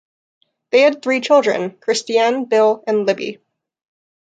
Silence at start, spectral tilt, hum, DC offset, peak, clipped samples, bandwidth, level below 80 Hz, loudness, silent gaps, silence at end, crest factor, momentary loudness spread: 0.75 s; -3.5 dB/octave; none; under 0.1%; -2 dBFS; under 0.1%; 9.4 kHz; -72 dBFS; -16 LUFS; none; 1.05 s; 16 dB; 7 LU